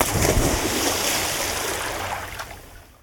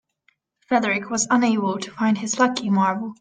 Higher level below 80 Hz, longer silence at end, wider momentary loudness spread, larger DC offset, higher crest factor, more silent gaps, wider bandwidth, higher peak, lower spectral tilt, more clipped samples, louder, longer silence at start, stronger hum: first, -34 dBFS vs -68 dBFS; about the same, 0.2 s vs 0.1 s; first, 14 LU vs 4 LU; neither; about the same, 22 dB vs 18 dB; neither; first, 19 kHz vs 9.6 kHz; about the same, -2 dBFS vs -4 dBFS; about the same, -3 dB/octave vs -4 dB/octave; neither; about the same, -22 LUFS vs -21 LUFS; second, 0 s vs 0.7 s; neither